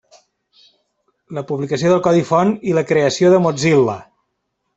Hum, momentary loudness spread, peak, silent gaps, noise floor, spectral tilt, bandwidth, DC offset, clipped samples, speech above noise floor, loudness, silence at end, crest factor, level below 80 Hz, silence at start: none; 12 LU; -2 dBFS; none; -72 dBFS; -6 dB/octave; 8.2 kHz; under 0.1%; under 0.1%; 57 dB; -15 LUFS; 0.75 s; 16 dB; -56 dBFS; 1.3 s